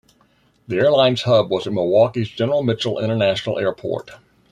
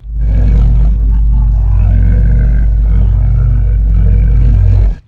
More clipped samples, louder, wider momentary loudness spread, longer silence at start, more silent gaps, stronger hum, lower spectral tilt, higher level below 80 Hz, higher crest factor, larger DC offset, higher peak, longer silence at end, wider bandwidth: second, under 0.1% vs 0.2%; second, -19 LUFS vs -11 LUFS; first, 9 LU vs 2 LU; first, 0.7 s vs 0.05 s; neither; neither; second, -6.5 dB/octave vs -10.5 dB/octave; second, -58 dBFS vs -8 dBFS; first, 16 dB vs 8 dB; neither; about the same, -2 dBFS vs 0 dBFS; first, 0.35 s vs 0.1 s; first, 10 kHz vs 2.5 kHz